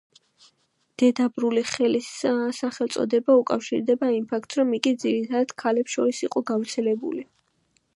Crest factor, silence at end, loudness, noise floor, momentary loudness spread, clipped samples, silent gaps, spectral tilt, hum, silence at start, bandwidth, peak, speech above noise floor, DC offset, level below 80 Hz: 20 dB; 0.7 s; -24 LUFS; -68 dBFS; 7 LU; under 0.1%; none; -4 dB/octave; none; 1 s; 11.5 kHz; -4 dBFS; 45 dB; under 0.1%; -72 dBFS